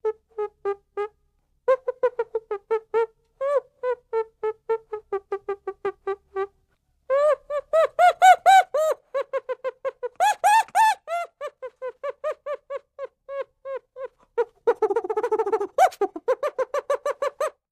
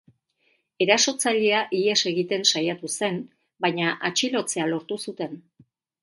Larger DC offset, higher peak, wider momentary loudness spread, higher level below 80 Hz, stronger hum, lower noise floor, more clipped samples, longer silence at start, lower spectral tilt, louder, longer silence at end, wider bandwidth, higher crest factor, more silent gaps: neither; about the same, -4 dBFS vs -2 dBFS; first, 17 LU vs 13 LU; first, -68 dBFS vs -74 dBFS; neither; about the same, -68 dBFS vs -69 dBFS; neither; second, 0.05 s vs 0.8 s; about the same, -1.5 dB/octave vs -2.5 dB/octave; about the same, -24 LUFS vs -23 LUFS; second, 0.2 s vs 0.65 s; first, 15.5 kHz vs 11.5 kHz; about the same, 20 dB vs 24 dB; neither